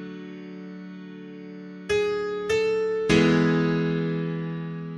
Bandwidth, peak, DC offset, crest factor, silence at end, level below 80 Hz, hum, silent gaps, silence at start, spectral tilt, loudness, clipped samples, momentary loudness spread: 11.5 kHz; -6 dBFS; under 0.1%; 20 dB; 0 s; -52 dBFS; none; none; 0 s; -6.5 dB/octave; -24 LUFS; under 0.1%; 20 LU